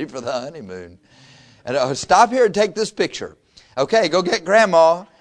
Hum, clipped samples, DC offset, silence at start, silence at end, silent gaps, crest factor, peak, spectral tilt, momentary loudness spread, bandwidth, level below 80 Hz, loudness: none; under 0.1%; under 0.1%; 0 s; 0.15 s; none; 18 dB; 0 dBFS; -3.5 dB/octave; 20 LU; 10.5 kHz; -56 dBFS; -17 LUFS